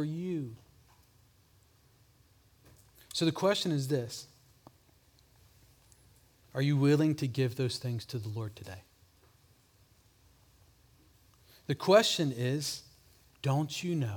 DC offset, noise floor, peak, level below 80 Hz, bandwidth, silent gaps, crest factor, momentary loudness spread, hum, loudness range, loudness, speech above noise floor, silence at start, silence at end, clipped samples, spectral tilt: under 0.1%; -65 dBFS; -12 dBFS; -70 dBFS; 19 kHz; none; 24 dB; 18 LU; none; 11 LU; -31 LUFS; 35 dB; 0 s; 0 s; under 0.1%; -5.5 dB/octave